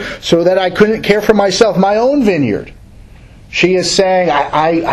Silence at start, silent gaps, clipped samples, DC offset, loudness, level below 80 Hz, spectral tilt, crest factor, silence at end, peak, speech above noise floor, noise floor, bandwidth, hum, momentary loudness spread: 0 s; none; 0.4%; under 0.1%; -12 LUFS; -40 dBFS; -4.5 dB/octave; 12 dB; 0 s; 0 dBFS; 26 dB; -37 dBFS; 13.5 kHz; none; 4 LU